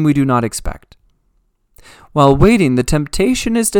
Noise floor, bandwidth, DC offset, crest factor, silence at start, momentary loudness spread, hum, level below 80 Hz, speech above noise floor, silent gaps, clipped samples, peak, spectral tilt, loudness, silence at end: -61 dBFS; 19 kHz; under 0.1%; 14 dB; 0 s; 12 LU; none; -28 dBFS; 47 dB; none; under 0.1%; 0 dBFS; -5.5 dB/octave; -14 LUFS; 0 s